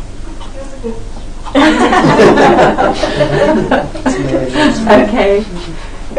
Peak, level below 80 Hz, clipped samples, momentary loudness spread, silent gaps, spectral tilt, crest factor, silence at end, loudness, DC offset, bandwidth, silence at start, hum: 0 dBFS; -24 dBFS; 0.2%; 22 LU; none; -5.5 dB/octave; 10 dB; 0 s; -10 LUFS; under 0.1%; 10.5 kHz; 0 s; none